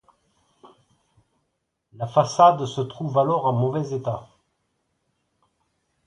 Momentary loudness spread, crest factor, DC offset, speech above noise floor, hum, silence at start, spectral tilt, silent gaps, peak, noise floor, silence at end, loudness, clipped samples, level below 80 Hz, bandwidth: 13 LU; 22 dB; under 0.1%; 55 dB; none; 2 s; -6.5 dB/octave; none; -2 dBFS; -76 dBFS; 1.85 s; -21 LUFS; under 0.1%; -64 dBFS; 11 kHz